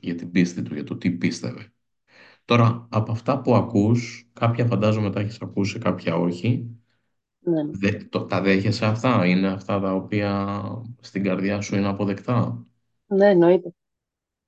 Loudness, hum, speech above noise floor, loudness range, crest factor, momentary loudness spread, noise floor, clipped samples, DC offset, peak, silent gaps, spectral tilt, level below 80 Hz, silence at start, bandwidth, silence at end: -23 LUFS; none; 63 dB; 3 LU; 18 dB; 12 LU; -85 dBFS; under 0.1%; under 0.1%; -4 dBFS; none; -7 dB/octave; -54 dBFS; 0.05 s; 8.4 kHz; 0.75 s